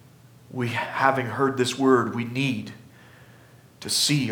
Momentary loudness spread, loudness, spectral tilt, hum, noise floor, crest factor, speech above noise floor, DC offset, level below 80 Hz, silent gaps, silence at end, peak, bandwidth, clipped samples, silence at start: 13 LU; -24 LUFS; -4 dB/octave; none; -51 dBFS; 20 dB; 28 dB; under 0.1%; -68 dBFS; none; 0 s; -4 dBFS; 20 kHz; under 0.1%; 0.5 s